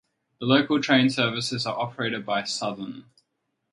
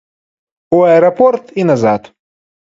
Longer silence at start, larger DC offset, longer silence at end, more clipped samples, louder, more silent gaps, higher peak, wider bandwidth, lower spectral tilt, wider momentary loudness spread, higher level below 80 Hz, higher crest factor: second, 0.4 s vs 0.7 s; neither; about the same, 0.7 s vs 0.7 s; neither; second, -24 LUFS vs -11 LUFS; neither; second, -4 dBFS vs 0 dBFS; first, 11.5 kHz vs 7.6 kHz; second, -4.5 dB/octave vs -7.5 dB/octave; first, 13 LU vs 7 LU; second, -68 dBFS vs -56 dBFS; first, 22 dB vs 14 dB